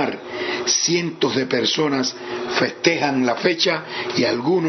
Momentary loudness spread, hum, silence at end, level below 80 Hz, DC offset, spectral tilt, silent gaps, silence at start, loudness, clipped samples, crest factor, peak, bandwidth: 7 LU; none; 0 s; -64 dBFS; under 0.1%; -3 dB/octave; none; 0 s; -20 LUFS; under 0.1%; 20 dB; 0 dBFS; 6.4 kHz